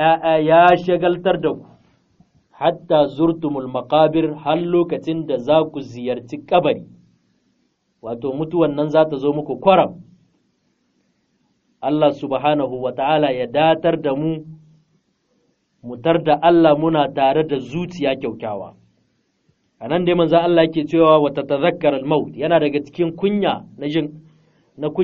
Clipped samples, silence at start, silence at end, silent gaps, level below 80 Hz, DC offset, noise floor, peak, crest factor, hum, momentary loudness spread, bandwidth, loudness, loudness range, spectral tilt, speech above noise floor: under 0.1%; 0 s; 0 s; none; -54 dBFS; under 0.1%; -66 dBFS; 0 dBFS; 18 dB; none; 12 LU; 6.8 kHz; -18 LUFS; 5 LU; -5 dB/octave; 49 dB